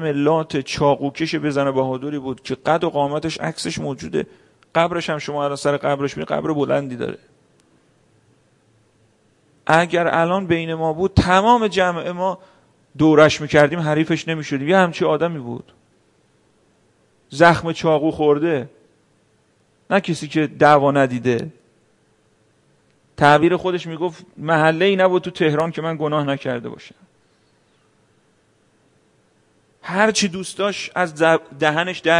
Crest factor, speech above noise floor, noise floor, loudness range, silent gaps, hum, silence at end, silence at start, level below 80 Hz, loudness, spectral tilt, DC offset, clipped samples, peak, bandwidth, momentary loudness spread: 20 dB; 42 dB; -60 dBFS; 7 LU; none; none; 0 s; 0 s; -48 dBFS; -19 LUFS; -5.5 dB/octave; under 0.1%; under 0.1%; 0 dBFS; 11.5 kHz; 12 LU